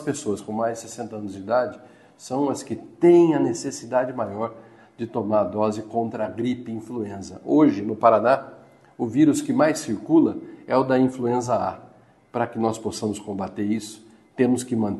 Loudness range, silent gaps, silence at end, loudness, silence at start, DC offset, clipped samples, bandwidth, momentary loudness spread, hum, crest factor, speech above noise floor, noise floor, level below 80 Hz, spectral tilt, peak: 6 LU; none; 0 s; -23 LUFS; 0 s; under 0.1%; under 0.1%; 12.5 kHz; 14 LU; none; 20 dB; 30 dB; -52 dBFS; -64 dBFS; -6 dB/octave; -2 dBFS